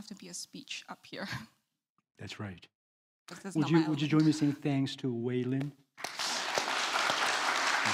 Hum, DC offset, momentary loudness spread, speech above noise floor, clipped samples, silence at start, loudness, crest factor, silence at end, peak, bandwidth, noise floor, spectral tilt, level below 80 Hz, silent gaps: none; under 0.1%; 15 LU; 49 dB; under 0.1%; 0 s; -32 LUFS; 20 dB; 0 s; -14 dBFS; 16 kHz; -81 dBFS; -4 dB/octave; -74 dBFS; 1.90-1.96 s, 2.75-3.26 s